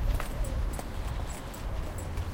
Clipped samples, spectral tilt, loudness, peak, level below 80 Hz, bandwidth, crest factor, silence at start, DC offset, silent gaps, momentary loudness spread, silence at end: under 0.1%; -5.5 dB/octave; -36 LUFS; -18 dBFS; -34 dBFS; 17 kHz; 14 dB; 0 s; under 0.1%; none; 4 LU; 0 s